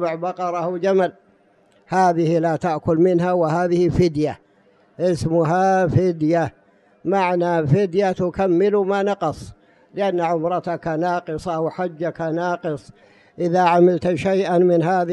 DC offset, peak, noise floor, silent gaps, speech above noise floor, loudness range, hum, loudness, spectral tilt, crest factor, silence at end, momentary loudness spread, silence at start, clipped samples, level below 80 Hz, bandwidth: under 0.1%; -4 dBFS; -57 dBFS; none; 38 dB; 4 LU; none; -20 LUFS; -7.5 dB/octave; 14 dB; 0 s; 9 LU; 0 s; under 0.1%; -48 dBFS; 11 kHz